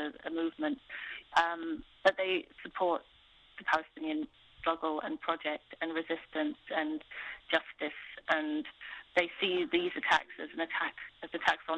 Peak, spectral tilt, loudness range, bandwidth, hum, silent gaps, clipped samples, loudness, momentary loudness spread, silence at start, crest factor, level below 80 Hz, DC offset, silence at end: -12 dBFS; -3.5 dB/octave; 3 LU; 9.6 kHz; none; none; under 0.1%; -34 LUFS; 12 LU; 0 s; 22 dB; -68 dBFS; under 0.1%; 0 s